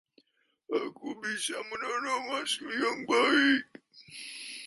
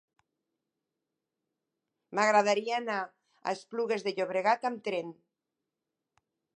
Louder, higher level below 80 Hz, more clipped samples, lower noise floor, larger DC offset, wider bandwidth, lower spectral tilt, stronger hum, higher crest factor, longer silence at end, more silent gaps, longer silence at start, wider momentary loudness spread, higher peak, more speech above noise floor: about the same, -30 LUFS vs -30 LUFS; first, -76 dBFS vs -90 dBFS; neither; second, -73 dBFS vs -88 dBFS; neither; about the same, 11.5 kHz vs 10.5 kHz; second, -2 dB/octave vs -3.5 dB/octave; neither; about the same, 20 dB vs 22 dB; second, 0 s vs 1.45 s; neither; second, 0.7 s vs 2.1 s; first, 17 LU vs 12 LU; about the same, -12 dBFS vs -12 dBFS; second, 43 dB vs 58 dB